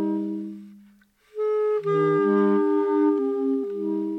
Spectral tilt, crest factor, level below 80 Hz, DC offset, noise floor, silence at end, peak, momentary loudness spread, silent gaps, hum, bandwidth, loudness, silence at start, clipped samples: -9.5 dB/octave; 12 dB; -76 dBFS; under 0.1%; -57 dBFS; 0 s; -12 dBFS; 13 LU; none; none; 4.7 kHz; -23 LUFS; 0 s; under 0.1%